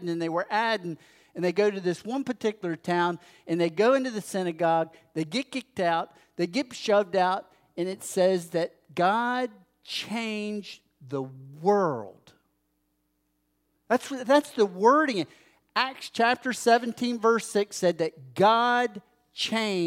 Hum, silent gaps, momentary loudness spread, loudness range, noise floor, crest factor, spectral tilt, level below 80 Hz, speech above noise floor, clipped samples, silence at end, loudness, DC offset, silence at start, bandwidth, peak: none; none; 12 LU; 6 LU; -74 dBFS; 20 dB; -4.5 dB/octave; -78 dBFS; 48 dB; under 0.1%; 0 s; -27 LUFS; under 0.1%; 0 s; 16 kHz; -8 dBFS